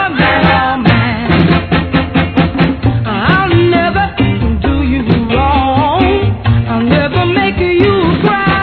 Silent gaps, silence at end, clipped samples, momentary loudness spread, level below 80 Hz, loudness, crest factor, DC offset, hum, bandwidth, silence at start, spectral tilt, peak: none; 0 s; 0.3%; 4 LU; -24 dBFS; -11 LUFS; 10 dB; 0.2%; none; 5.4 kHz; 0 s; -9.5 dB/octave; 0 dBFS